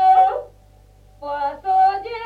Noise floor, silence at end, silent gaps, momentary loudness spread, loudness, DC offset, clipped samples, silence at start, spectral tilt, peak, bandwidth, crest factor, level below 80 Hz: -49 dBFS; 0 s; none; 15 LU; -19 LUFS; under 0.1%; under 0.1%; 0 s; -4.5 dB/octave; -6 dBFS; 5 kHz; 14 dB; -52 dBFS